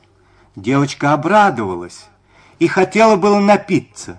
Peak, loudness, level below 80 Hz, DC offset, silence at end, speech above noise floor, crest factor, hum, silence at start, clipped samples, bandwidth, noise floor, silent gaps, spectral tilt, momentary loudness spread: 0 dBFS; -14 LUFS; -54 dBFS; under 0.1%; 0.05 s; 37 dB; 14 dB; none; 0.55 s; under 0.1%; 10.5 kHz; -51 dBFS; none; -6 dB/octave; 13 LU